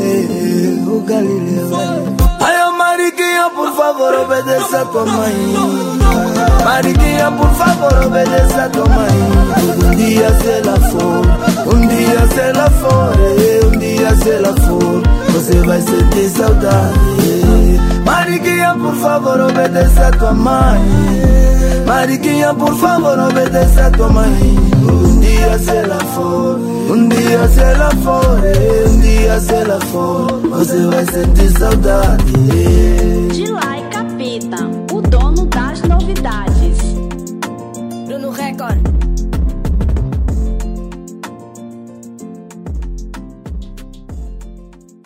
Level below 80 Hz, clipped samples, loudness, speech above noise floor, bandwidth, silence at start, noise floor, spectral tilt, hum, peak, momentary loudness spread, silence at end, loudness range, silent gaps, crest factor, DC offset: -14 dBFS; under 0.1%; -12 LUFS; 28 dB; 16.5 kHz; 0 s; -37 dBFS; -6 dB/octave; none; 0 dBFS; 12 LU; 0.4 s; 7 LU; none; 10 dB; under 0.1%